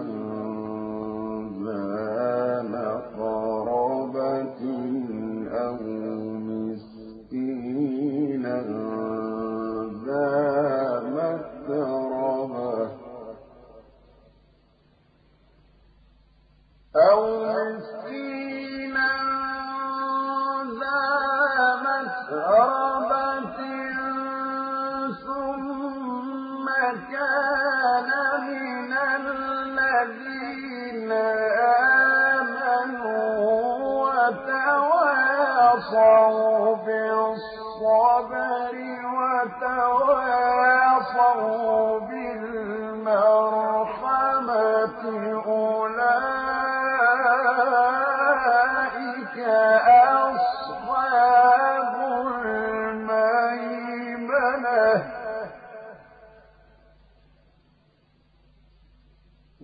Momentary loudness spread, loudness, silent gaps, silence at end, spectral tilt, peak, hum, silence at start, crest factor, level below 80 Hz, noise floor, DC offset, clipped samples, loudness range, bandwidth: 13 LU; -23 LUFS; none; 0 s; -9.5 dB/octave; -6 dBFS; none; 0 s; 16 dB; -62 dBFS; -62 dBFS; under 0.1%; under 0.1%; 9 LU; 5 kHz